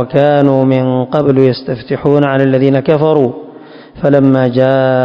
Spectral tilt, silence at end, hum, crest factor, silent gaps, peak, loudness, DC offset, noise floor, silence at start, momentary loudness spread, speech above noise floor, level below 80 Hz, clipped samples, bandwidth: -10 dB/octave; 0 s; none; 10 dB; none; 0 dBFS; -11 LUFS; under 0.1%; -34 dBFS; 0 s; 7 LU; 24 dB; -48 dBFS; 1%; 5.4 kHz